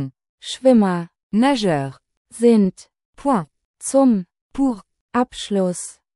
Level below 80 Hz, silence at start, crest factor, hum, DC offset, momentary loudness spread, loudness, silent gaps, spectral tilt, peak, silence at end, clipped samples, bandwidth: -52 dBFS; 0 s; 18 dB; none; under 0.1%; 17 LU; -19 LUFS; 0.29-0.38 s, 1.23-1.30 s, 2.17-2.25 s, 3.05-3.13 s, 3.65-3.74 s, 4.41-4.50 s, 5.01-5.09 s; -5.5 dB/octave; -2 dBFS; 0.25 s; under 0.1%; 12 kHz